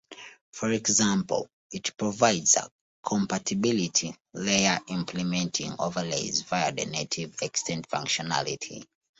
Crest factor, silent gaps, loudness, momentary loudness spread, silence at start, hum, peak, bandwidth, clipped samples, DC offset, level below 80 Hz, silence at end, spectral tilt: 24 dB; 0.41-0.53 s, 1.53-1.70 s, 2.72-3.03 s; -27 LUFS; 14 LU; 0.1 s; none; -6 dBFS; 8.2 kHz; under 0.1%; under 0.1%; -64 dBFS; 0.35 s; -3 dB/octave